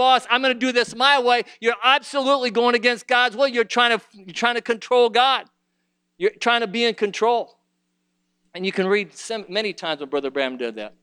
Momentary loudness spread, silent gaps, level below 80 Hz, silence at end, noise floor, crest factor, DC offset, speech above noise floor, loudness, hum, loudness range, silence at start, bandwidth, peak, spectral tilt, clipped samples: 9 LU; none; -74 dBFS; 0.15 s; -73 dBFS; 18 dB; under 0.1%; 53 dB; -20 LUFS; 60 Hz at -65 dBFS; 7 LU; 0 s; 11 kHz; -2 dBFS; -3 dB/octave; under 0.1%